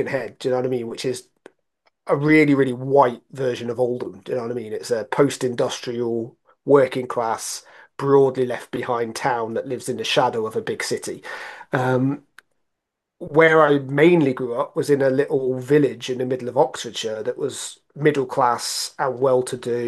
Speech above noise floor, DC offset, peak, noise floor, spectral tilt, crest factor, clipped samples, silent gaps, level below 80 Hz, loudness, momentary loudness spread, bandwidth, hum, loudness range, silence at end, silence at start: 60 dB; under 0.1%; -2 dBFS; -80 dBFS; -5 dB/octave; 20 dB; under 0.1%; none; -70 dBFS; -21 LUFS; 12 LU; 12.5 kHz; none; 5 LU; 0 s; 0 s